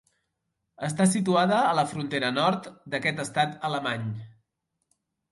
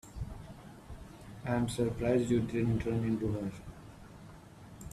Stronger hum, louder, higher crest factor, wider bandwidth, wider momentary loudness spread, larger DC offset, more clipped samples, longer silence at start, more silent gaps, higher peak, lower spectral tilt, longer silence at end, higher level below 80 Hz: neither; first, -26 LUFS vs -33 LUFS; about the same, 18 dB vs 18 dB; second, 11.5 kHz vs 14 kHz; second, 11 LU vs 22 LU; neither; neither; first, 0.8 s vs 0.05 s; neither; first, -10 dBFS vs -16 dBFS; second, -4.5 dB/octave vs -7 dB/octave; first, 1.05 s vs 0 s; second, -68 dBFS vs -52 dBFS